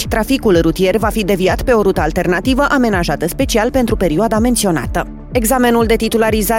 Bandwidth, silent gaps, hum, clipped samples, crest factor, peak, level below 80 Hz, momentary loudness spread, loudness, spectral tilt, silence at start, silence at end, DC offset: 17 kHz; none; none; under 0.1%; 12 dB; 0 dBFS; -26 dBFS; 5 LU; -14 LUFS; -5 dB/octave; 0 s; 0 s; under 0.1%